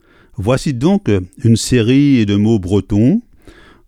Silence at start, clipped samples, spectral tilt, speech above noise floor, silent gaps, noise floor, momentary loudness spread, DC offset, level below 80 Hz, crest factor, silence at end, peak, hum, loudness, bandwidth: 0.4 s; under 0.1%; -6.5 dB/octave; 29 dB; none; -42 dBFS; 7 LU; under 0.1%; -38 dBFS; 12 dB; 0.35 s; 0 dBFS; none; -14 LUFS; 13.5 kHz